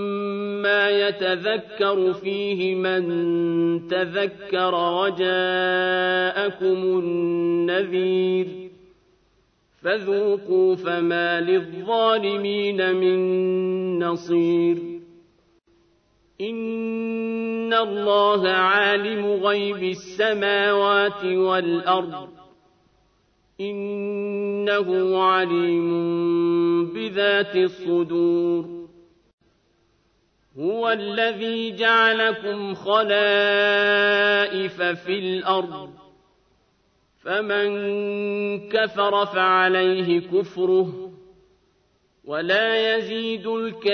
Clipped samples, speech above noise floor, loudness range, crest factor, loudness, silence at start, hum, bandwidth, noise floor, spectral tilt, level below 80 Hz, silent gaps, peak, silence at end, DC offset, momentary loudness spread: under 0.1%; 43 dB; 6 LU; 16 dB; -21 LUFS; 0 s; none; 6.4 kHz; -65 dBFS; -6 dB/octave; -68 dBFS; 29.33-29.38 s; -6 dBFS; 0 s; under 0.1%; 9 LU